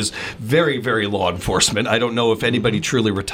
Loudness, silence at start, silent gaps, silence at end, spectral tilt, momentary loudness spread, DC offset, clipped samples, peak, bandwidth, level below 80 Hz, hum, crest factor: -18 LUFS; 0 s; none; 0 s; -4 dB/octave; 4 LU; under 0.1%; under 0.1%; -2 dBFS; 16.5 kHz; -42 dBFS; none; 18 dB